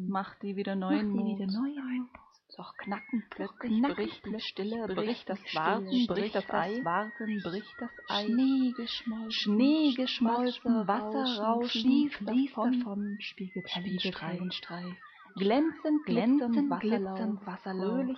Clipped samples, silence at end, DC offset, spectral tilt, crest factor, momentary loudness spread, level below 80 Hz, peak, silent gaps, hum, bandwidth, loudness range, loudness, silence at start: under 0.1%; 0 s; under 0.1%; -7 dB/octave; 16 dB; 11 LU; -70 dBFS; -14 dBFS; none; none; 6.4 kHz; 6 LU; -31 LUFS; 0 s